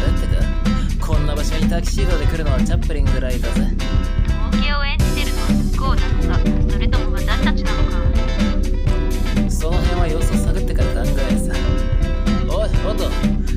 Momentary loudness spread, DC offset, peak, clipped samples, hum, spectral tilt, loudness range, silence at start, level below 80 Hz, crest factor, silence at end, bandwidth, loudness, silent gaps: 2 LU; under 0.1%; -4 dBFS; under 0.1%; none; -6 dB/octave; 1 LU; 0 s; -18 dBFS; 12 dB; 0 s; 13.5 kHz; -20 LUFS; none